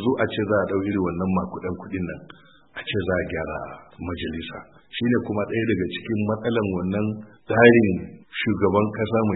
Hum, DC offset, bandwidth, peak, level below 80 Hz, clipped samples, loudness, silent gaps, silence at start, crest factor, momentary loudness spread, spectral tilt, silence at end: none; under 0.1%; 4.1 kHz; 0 dBFS; -50 dBFS; under 0.1%; -23 LUFS; none; 0 s; 24 dB; 14 LU; -11.5 dB/octave; 0 s